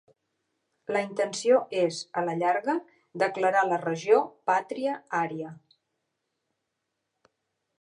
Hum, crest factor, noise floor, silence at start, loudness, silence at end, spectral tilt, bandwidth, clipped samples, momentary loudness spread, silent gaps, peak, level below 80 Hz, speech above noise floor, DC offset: none; 20 dB; -82 dBFS; 0.9 s; -27 LUFS; 2.2 s; -4.5 dB/octave; 11 kHz; under 0.1%; 9 LU; none; -8 dBFS; -84 dBFS; 56 dB; under 0.1%